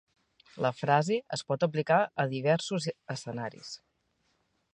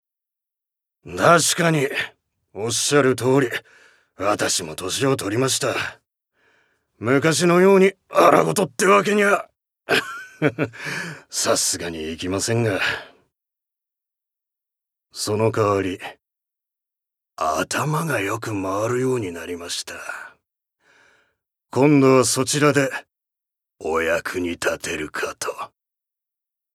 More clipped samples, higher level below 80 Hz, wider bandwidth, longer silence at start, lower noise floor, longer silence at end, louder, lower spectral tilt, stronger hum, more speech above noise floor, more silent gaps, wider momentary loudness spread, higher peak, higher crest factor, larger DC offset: neither; second, -76 dBFS vs -62 dBFS; second, 10.5 kHz vs 16 kHz; second, 0.55 s vs 1.05 s; second, -75 dBFS vs -84 dBFS; about the same, 1 s vs 1.05 s; second, -30 LUFS vs -20 LUFS; first, -5.5 dB/octave vs -4 dB/octave; neither; second, 45 dB vs 64 dB; neither; about the same, 13 LU vs 15 LU; second, -10 dBFS vs 0 dBFS; about the same, 22 dB vs 22 dB; neither